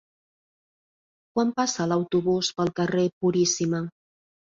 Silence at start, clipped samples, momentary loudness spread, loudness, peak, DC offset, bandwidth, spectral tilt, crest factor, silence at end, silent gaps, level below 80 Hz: 1.35 s; under 0.1%; 6 LU; -25 LUFS; -10 dBFS; under 0.1%; 7.8 kHz; -4.5 dB/octave; 16 dB; 0.7 s; 3.13-3.21 s; -64 dBFS